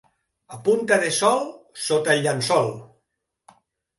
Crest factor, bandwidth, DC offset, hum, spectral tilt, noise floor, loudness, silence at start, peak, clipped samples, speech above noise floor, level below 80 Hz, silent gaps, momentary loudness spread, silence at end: 18 dB; 12 kHz; under 0.1%; none; -3.5 dB/octave; -77 dBFS; -21 LUFS; 0.5 s; -4 dBFS; under 0.1%; 56 dB; -68 dBFS; none; 13 LU; 1.15 s